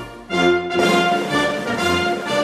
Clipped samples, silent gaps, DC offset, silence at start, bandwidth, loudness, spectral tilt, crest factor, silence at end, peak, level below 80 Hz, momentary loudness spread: under 0.1%; none; under 0.1%; 0 s; 15 kHz; -18 LUFS; -4.5 dB/octave; 14 dB; 0 s; -4 dBFS; -50 dBFS; 5 LU